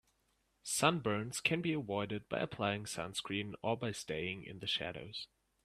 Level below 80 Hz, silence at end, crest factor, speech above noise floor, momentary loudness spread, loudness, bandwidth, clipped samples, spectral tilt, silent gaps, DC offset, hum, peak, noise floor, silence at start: -70 dBFS; 0.4 s; 26 dB; 40 dB; 11 LU; -37 LUFS; 15 kHz; under 0.1%; -4 dB/octave; none; under 0.1%; none; -14 dBFS; -78 dBFS; 0.65 s